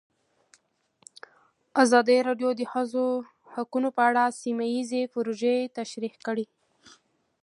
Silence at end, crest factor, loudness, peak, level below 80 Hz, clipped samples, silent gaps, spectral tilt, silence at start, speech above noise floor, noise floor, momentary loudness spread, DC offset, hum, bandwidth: 1 s; 22 dB; -26 LUFS; -6 dBFS; -82 dBFS; under 0.1%; none; -3.5 dB/octave; 1.75 s; 43 dB; -68 dBFS; 13 LU; under 0.1%; none; 11.5 kHz